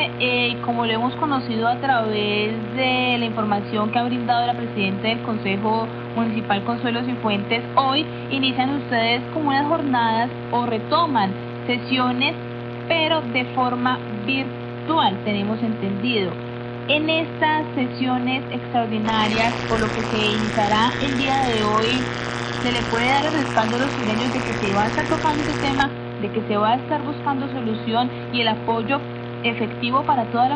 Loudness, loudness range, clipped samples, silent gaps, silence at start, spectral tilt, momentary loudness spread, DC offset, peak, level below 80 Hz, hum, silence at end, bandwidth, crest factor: -21 LUFS; 2 LU; under 0.1%; none; 0 s; -5.5 dB/octave; 6 LU; under 0.1%; -4 dBFS; -48 dBFS; 60 Hz at -30 dBFS; 0 s; 9.6 kHz; 16 dB